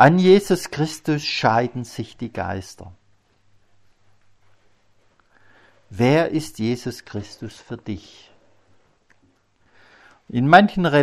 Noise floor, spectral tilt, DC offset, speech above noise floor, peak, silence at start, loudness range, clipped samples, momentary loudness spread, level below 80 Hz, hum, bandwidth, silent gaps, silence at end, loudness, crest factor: -61 dBFS; -6 dB/octave; under 0.1%; 42 dB; 0 dBFS; 0 s; 15 LU; under 0.1%; 21 LU; -54 dBFS; none; 15 kHz; none; 0 s; -20 LUFS; 22 dB